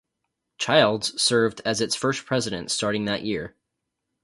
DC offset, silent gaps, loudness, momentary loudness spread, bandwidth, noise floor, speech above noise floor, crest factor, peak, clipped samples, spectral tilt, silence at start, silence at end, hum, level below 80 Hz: under 0.1%; none; -23 LUFS; 10 LU; 11.5 kHz; -81 dBFS; 58 dB; 22 dB; -4 dBFS; under 0.1%; -3.5 dB/octave; 0.6 s; 0.75 s; none; -58 dBFS